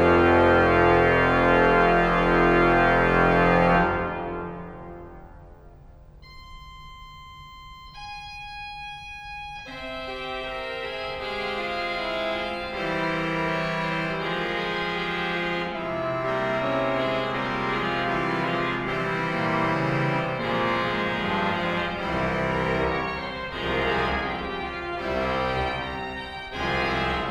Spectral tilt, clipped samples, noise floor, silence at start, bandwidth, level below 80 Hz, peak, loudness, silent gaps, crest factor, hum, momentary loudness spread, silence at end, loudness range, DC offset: -6.5 dB/octave; under 0.1%; -47 dBFS; 0 s; 13 kHz; -42 dBFS; -6 dBFS; -24 LUFS; none; 18 dB; none; 18 LU; 0 s; 19 LU; under 0.1%